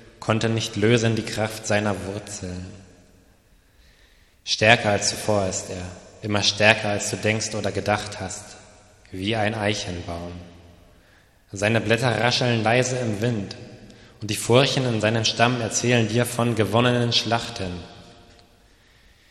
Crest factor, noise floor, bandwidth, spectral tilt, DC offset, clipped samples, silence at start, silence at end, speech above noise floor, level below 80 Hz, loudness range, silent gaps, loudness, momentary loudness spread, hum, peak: 24 dB; -57 dBFS; 13.5 kHz; -4 dB/octave; under 0.1%; under 0.1%; 0 s; 1.2 s; 34 dB; -54 dBFS; 7 LU; none; -22 LUFS; 18 LU; none; 0 dBFS